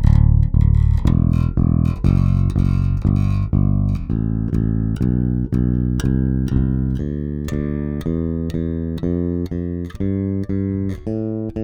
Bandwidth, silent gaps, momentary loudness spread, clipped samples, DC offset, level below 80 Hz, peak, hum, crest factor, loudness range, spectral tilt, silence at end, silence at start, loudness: 9.2 kHz; none; 8 LU; under 0.1%; under 0.1%; -24 dBFS; 0 dBFS; none; 16 dB; 5 LU; -9.5 dB/octave; 0 s; 0 s; -19 LUFS